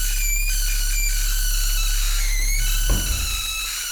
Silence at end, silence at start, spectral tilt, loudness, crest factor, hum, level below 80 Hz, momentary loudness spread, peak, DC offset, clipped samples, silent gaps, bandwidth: 0 s; 0 s; -1 dB/octave; -22 LUFS; 12 dB; none; -22 dBFS; 1 LU; -8 dBFS; under 0.1%; under 0.1%; none; over 20 kHz